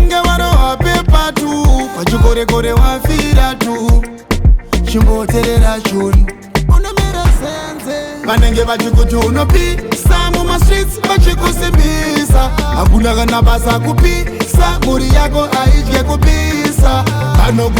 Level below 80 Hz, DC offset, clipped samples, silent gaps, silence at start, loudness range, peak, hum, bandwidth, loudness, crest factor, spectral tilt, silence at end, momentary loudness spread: -12 dBFS; under 0.1%; under 0.1%; none; 0 s; 2 LU; 0 dBFS; none; 19 kHz; -12 LUFS; 10 dB; -5.5 dB/octave; 0 s; 4 LU